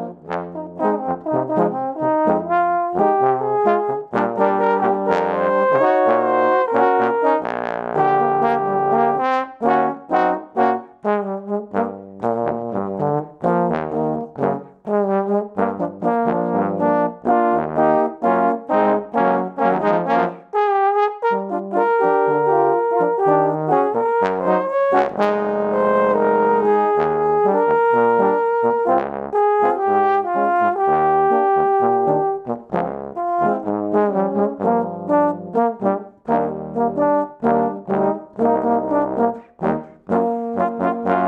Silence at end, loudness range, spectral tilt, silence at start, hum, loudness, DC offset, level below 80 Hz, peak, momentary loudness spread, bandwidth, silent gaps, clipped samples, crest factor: 0 s; 4 LU; -8.5 dB/octave; 0 s; none; -19 LUFS; under 0.1%; -58 dBFS; -2 dBFS; 7 LU; 7.2 kHz; none; under 0.1%; 16 dB